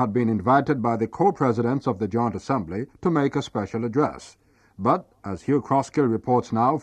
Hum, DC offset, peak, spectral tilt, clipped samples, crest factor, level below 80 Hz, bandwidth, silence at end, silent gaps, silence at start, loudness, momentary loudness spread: none; under 0.1%; -6 dBFS; -8 dB/octave; under 0.1%; 16 dB; -56 dBFS; 9.6 kHz; 0 s; none; 0 s; -24 LUFS; 7 LU